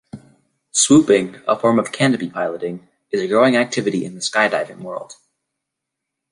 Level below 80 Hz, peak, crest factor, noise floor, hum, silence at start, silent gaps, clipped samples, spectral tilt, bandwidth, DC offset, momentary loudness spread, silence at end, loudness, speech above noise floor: -60 dBFS; -2 dBFS; 18 dB; -81 dBFS; none; 0.15 s; none; under 0.1%; -4 dB/octave; 11.5 kHz; under 0.1%; 16 LU; 1.2 s; -17 LUFS; 63 dB